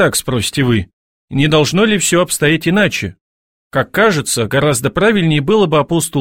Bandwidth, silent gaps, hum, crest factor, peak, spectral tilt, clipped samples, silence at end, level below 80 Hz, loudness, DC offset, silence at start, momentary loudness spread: 16.5 kHz; 0.93-1.28 s, 3.21-3.71 s; none; 14 dB; 0 dBFS; -4.5 dB/octave; under 0.1%; 0 s; -42 dBFS; -14 LUFS; 0.4%; 0 s; 7 LU